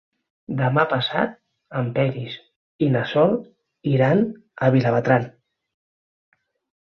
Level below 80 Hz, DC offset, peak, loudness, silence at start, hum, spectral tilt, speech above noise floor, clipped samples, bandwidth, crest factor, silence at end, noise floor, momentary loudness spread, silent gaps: -60 dBFS; under 0.1%; -2 dBFS; -21 LUFS; 0.5 s; none; -8.5 dB/octave; over 70 dB; under 0.1%; 6.4 kHz; 20 dB; 1.55 s; under -90 dBFS; 13 LU; 2.56-2.79 s